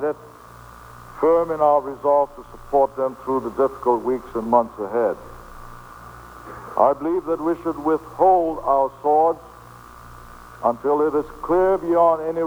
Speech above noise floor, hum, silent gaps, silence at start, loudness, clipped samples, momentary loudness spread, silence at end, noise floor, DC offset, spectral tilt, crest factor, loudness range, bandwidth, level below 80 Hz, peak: 23 dB; 60 Hz at -50 dBFS; none; 0 s; -20 LUFS; under 0.1%; 23 LU; 0 s; -43 dBFS; under 0.1%; -7.5 dB/octave; 18 dB; 4 LU; over 20 kHz; -48 dBFS; -2 dBFS